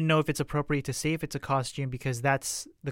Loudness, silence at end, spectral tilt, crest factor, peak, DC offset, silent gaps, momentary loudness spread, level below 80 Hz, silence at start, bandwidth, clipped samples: -30 LUFS; 0 s; -5 dB/octave; 18 dB; -12 dBFS; under 0.1%; none; 7 LU; -52 dBFS; 0 s; 16.5 kHz; under 0.1%